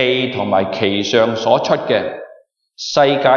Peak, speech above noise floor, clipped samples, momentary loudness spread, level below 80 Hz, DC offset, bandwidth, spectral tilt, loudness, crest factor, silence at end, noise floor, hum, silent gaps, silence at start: 0 dBFS; 31 dB; under 0.1%; 8 LU; -58 dBFS; under 0.1%; 7.2 kHz; -4.5 dB/octave; -16 LUFS; 14 dB; 0 s; -46 dBFS; none; none; 0 s